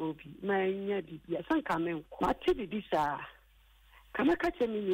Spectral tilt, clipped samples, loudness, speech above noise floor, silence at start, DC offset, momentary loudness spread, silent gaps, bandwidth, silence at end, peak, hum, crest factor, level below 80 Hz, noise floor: -6.5 dB/octave; under 0.1%; -33 LUFS; 30 dB; 0 s; under 0.1%; 9 LU; none; 16 kHz; 0 s; -20 dBFS; none; 14 dB; -56 dBFS; -62 dBFS